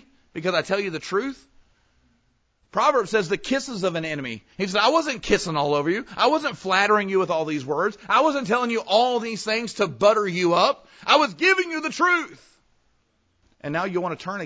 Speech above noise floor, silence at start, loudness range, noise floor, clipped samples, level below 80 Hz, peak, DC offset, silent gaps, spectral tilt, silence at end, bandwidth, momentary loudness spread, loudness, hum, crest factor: 45 dB; 0.35 s; 5 LU; -67 dBFS; under 0.1%; -58 dBFS; -4 dBFS; under 0.1%; none; -4 dB/octave; 0 s; 8 kHz; 10 LU; -22 LUFS; none; 20 dB